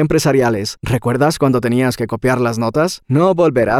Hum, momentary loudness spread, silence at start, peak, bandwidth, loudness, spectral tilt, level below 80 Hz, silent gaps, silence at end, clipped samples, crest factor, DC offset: none; 5 LU; 0 s; -2 dBFS; 16 kHz; -15 LUFS; -6 dB/octave; -40 dBFS; none; 0 s; under 0.1%; 12 dB; under 0.1%